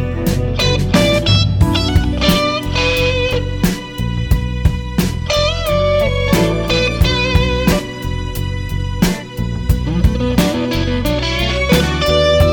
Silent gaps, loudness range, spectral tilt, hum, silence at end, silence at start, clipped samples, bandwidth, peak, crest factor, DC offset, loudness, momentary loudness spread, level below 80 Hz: none; 3 LU; -5.5 dB/octave; none; 0 s; 0 s; under 0.1%; 19 kHz; -2 dBFS; 12 dB; under 0.1%; -15 LUFS; 9 LU; -22 dBFS